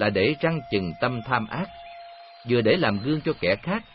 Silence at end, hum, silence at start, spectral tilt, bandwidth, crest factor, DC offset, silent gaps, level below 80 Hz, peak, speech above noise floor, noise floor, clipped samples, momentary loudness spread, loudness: 0.1 s; none; 0 s; -11 dB/octave; 5.8 kHz; 18 dB; under 0.1%; none; -54 dBFS; -8 dBFS; 20 dB; -44 dBFS; under 0.1%; 20 LU; -25 LUFS